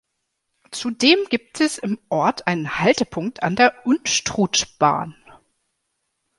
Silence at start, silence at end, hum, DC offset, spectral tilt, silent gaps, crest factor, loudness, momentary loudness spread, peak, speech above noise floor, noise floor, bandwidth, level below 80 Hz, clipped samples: 0.7 s; 1.25 s; none; under 0.1%; -3.5 dB/octave; none; 20 dB; -20 LUFS; 10 LU; 0 dBFS; 56 dB; -76 dBFS; 11.5 kHz; -56 dBFS; under 0.1%